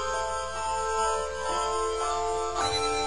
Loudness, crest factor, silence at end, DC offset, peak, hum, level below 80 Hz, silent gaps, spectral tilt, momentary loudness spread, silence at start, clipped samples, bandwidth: -28 LUFS; 14 dB; 0 s; 0.7%; -14 dBFS; none; -46 dBFS; none; -2 dB/octave; 3 LU; 0 s; under 0.1%; 11 kHz